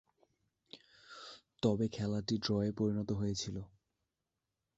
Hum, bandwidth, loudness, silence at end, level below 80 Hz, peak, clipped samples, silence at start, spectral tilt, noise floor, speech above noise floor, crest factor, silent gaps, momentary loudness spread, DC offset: none; 8 kHz; -36 LUFS; 1.1 s; -62 dBFS; -18 dBFS; under 0.1%; 0.75 s; -6 dB/octave; -89 dBFS; 54 dB; 22 dB; none; 22 LU; under 0.1%